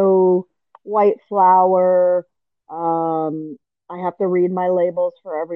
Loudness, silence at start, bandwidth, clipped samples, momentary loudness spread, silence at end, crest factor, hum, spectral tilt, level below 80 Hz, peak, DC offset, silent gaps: -18 LUFS; 0 s; 3.8 kHz; under 0.1%; 13 LU; 0 s; 14 dB; none; -11 dB/octave; -76 dBFS; -4 dBFS; under 0.1%; none